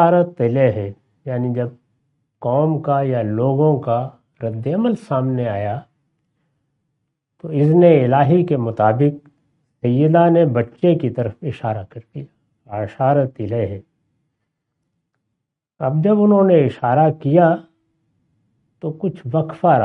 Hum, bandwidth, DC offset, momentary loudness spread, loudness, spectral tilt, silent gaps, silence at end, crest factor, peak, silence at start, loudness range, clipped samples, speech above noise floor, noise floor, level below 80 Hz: none; 4.5 kHz; under 0.1%; 16 LU; -17 LUFS; -10.5 dB/octave; none; 0 s; 18 dB; 0 dBFS; 0 s; 8 LU; under 0.1%; 62 dB; -78 dBFS; -60 dBFS